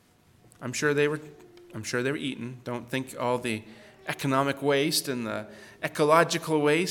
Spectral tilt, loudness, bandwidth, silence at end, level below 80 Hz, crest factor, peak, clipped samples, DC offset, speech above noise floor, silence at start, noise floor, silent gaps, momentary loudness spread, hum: -4.5 dB/octave; -27 LUFS; 18 kHz; 0 s; -68 dBFS; 22 dB; -6 dBFS; under 0.1%; under 0.1%; 32 dB; 0.6 s; -59 dBFS; none; 15 LU; none